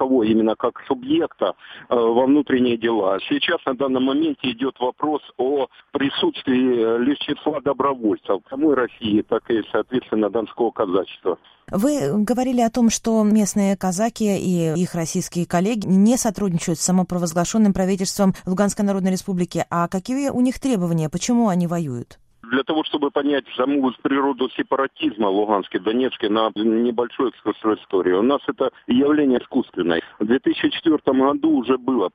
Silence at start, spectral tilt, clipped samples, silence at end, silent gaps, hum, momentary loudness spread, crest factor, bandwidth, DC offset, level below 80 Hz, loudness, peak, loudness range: 0 s; -5.5 dB/octave; under 0.1%; 0.05 s; none; none; 6 LU; 16 dB; 15.5 kHz; under 0.1%; -52 dBFS; -20 LUFS; -4 dBFS; 2 LU